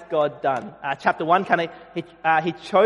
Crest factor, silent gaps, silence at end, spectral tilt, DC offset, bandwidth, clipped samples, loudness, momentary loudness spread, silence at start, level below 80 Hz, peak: 20 dB; none; 0 s; -6 dB/octave; under 0.1%; 11.5 kHz; under 0.1%; -23 LUFS; 10 LU; 0 s; -66 dBFS; -2 dBFS